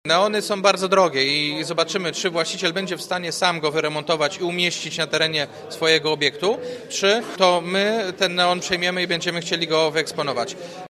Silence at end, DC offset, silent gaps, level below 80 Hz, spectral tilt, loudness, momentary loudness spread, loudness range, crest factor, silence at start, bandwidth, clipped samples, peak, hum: 0.05 s; under 0.1%; none; -66 dBFS; -3 dB/octave; -21 LUFS; 7 LU; 2 LU; 20 dB; 0.05 s; 15 kHz; under 0.1%; 0 dBFS; none